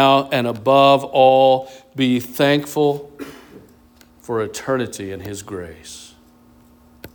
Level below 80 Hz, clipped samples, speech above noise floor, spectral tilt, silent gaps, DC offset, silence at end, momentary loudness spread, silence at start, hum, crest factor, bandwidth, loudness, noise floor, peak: -56 dBFS; under 0.1%; 33 dB; -5 dB/octave; none; under 0.1%; 0.1 s; 23 LU; 0 s; none; 18 dB; over 20 kHz; -17 LUFS; -50 dBFS; -2 dBFS